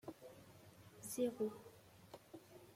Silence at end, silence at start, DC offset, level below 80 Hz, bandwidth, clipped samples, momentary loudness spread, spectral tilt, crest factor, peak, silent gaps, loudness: 0 s; 0.05 s; under 0.1%; -82 dBFS; 16.5 kHz; under 0.1%; 21 LU; -5 dB/octave; 20 dB; -28 dBFS; none; -45 LUFS